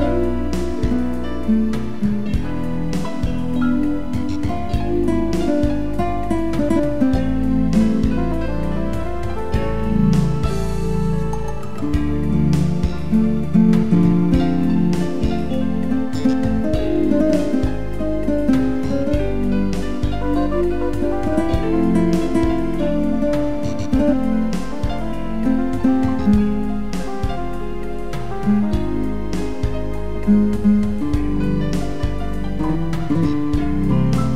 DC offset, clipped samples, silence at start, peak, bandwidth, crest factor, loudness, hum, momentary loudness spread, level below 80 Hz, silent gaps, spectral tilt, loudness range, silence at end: 7%; under 0.1%; 0 s; -4 dBFS; 13.5 kHz; 14 dB; -20 LUFS; none; 8 LU; -28 dBFS; none; -8 dB/octave; 4 LU; 0 s